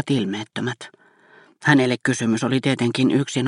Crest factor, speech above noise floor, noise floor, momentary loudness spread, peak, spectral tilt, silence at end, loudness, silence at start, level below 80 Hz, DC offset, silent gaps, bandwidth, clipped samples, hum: 20 dB; 32 dB; -52 dBFS; 11 LU; -2 dBFS; -5.5 dB/octave; 0 s; -21 LUFS; 0 s; -64 dBFS; under 0.1%; none; 11 kHz; under 0.1%; none